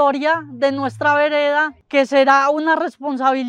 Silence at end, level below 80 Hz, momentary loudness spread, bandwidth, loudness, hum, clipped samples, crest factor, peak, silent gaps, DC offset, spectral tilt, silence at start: 0 s; -66 dBFS; 6 LU; 9.8 kHz; -17 LUFS; none; under 0.1%; 16 dB; -2 dBFS; none; under 0.1%; -4.5 dB/octave; 0 s